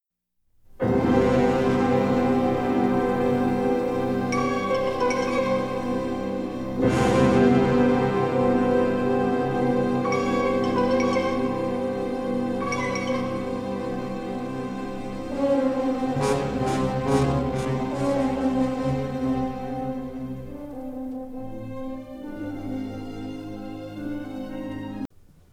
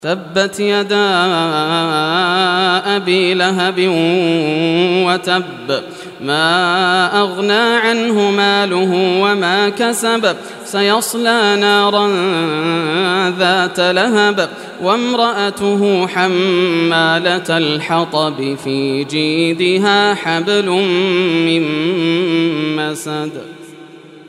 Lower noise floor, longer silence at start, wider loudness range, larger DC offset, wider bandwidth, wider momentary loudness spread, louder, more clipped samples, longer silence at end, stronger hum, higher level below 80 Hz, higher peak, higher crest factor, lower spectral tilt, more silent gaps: first, -73 dBFS vs -37 dBFS; first, 0.7 s vs 0 s; first, 12 LU vs 2 LU; neither; about the same, 13 kHz vs 14 kHz; first, 14 LU vs 6 LU; second, -24 LUFS vs -14 LUFS; neither; first, 0.45 s vs 0.05 s; neither; first, -46 dBFS vs -64 dBFS; second, -6 dBFS vs 0 dBFS; about the same, 18 dB vs 14 dB; first, -7 dB/octave vs -4.5 dB/octave; neither